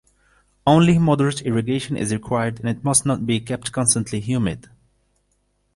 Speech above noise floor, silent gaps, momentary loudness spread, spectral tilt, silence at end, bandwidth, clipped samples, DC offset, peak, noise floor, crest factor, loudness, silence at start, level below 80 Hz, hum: 47 dB; none; 9 LU; -5 dB/octave; 1.15 s; 11.5 kHz; under 0.1%; under 0.1%; -2 dBFS; -67 dBFS; 18 dB; -20 LUFS; 0.65 s; -48 dBFS; 50 Hz at -50 dBFS